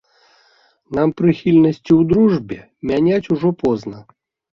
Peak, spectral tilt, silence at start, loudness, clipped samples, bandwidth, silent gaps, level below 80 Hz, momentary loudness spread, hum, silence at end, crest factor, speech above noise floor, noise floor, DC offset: -2 dBFS; -9 dB/octave; 0.9 s; -16 LUFS; under 0.1%; 6.8 kHz; none; -48 dBFS; 12 LU; none; 0.55 s; 14 dB; 40 dB; -56 dBFS; under 0.1%